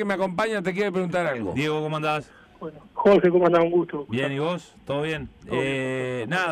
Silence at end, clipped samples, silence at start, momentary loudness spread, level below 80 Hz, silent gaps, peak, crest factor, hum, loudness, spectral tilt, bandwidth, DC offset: 0 s; under 0.1%; 0 s; 12 LU; -56 dBFS; none; -10 dBFS; 14 dB; none; -24 LUFS; -6.5 dB/octave; 12 kHz; under 0.1%